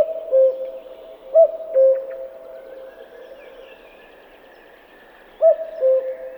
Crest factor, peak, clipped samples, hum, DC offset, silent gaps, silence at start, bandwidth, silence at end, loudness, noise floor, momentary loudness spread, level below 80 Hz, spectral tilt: 16 dB; -4 dBFS; under 0.1%; none; under 0.1%; none; 0 s; 19 kHz; 0 s; -18 LUFS; -47 dBFS; 25 LU; -64 dBFS; -5 dB/octave